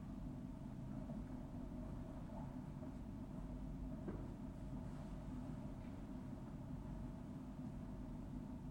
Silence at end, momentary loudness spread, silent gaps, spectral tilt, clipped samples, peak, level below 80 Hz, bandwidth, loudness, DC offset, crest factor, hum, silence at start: 0 s; 2 LU; none; -8.5 dB/octave; under 0.1%; -36 dBFS; -56 dBFS; 16.5 kHz; -51 LUFS; under 0.1%; 14 dB; none; 0 s